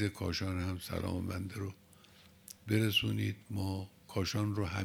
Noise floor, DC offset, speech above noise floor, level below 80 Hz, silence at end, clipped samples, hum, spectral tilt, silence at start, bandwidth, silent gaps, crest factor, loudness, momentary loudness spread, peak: -61 dBFS; under 0.1%; 26 dB; -62 dBFS; 0 s; under 0.1%; none; -5.5 dB/octave; 0 s; 17 kHz; none; 20 dB; -36 LUFS; 13 LU; -16 dBFS